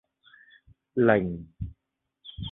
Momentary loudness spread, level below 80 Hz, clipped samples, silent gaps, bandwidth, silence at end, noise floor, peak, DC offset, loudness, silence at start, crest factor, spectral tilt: 22 LU; -50 dBFS; under 0.1%; none; 4 kHz; 0 s; -82 dBFS; -6 dBFS; under 0.1%; -25 LUFS; 0.95 s; 24 dB; -10.5 dB/octave